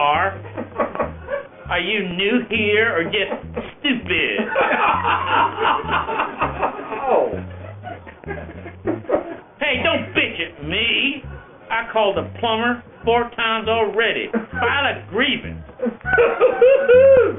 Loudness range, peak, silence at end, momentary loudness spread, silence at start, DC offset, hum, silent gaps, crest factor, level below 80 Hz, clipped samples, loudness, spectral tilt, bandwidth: 5 LU; -4 dBFS; 0 s; 15 LU; 0 s; under 0.1%; none; none; 16 dB; -44 dBFS; under 0.1%; -19 LUFS; -2 dB/octave; 3.9 kHz